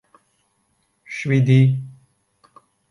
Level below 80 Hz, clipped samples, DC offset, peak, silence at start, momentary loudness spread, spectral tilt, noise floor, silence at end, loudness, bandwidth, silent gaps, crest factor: -62 dBFS; under 0.1%; under 0.1%; -4 dBFS; 1.1 s; 18 LU; -8 dB/octave; -67 dBFS; 1 s; -18 LUFS; 10.5 kHz; none; 18 dB